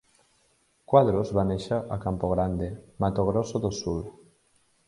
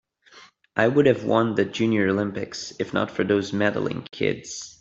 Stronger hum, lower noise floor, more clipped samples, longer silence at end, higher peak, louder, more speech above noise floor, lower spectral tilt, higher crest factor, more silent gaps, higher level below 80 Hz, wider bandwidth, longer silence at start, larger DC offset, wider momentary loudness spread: neither; first, -67 dBFS vs -52 dBFS; neither; first, 0.75 s vs 0.1 s; about the same, -6 dBFS vs -4 dBFS; second, -27 LUFS vs -23 LUFS; first, 41 dB vs 29 dB; first, -7.5 dB/octave vs -5.5 dB/octave; about the same, 22 dB vs 20 dB; neither; first, -46 dBFS vs -62 dBFS; first, 11.5 kHz vs 8 kHz; first, 0.9 s vs 0.35 s; neither; about the same, 11 LU vs 11 LU